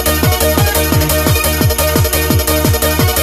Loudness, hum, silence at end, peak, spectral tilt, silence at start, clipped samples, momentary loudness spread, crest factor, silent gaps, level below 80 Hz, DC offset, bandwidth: -12 LUFS; none; 0 s; 0 dBFS; -4 dB/octave; 0 s; under 0.1%; 1 LU; 12 dB; none; -20 dBFS; under 0.1%; 16 kHz